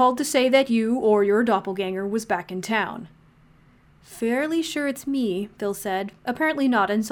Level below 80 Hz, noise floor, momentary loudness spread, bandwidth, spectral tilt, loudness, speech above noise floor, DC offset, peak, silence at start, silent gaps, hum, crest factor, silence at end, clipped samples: -60 dBFS; -55 dBFS; 9 LU; 19 kHz; -4.5 dB/octave; -23 LUFS; 33 dB; under 0.1%; -6 dBFS; 0 s; none; none; 18 dB; 0 s; under 0.1%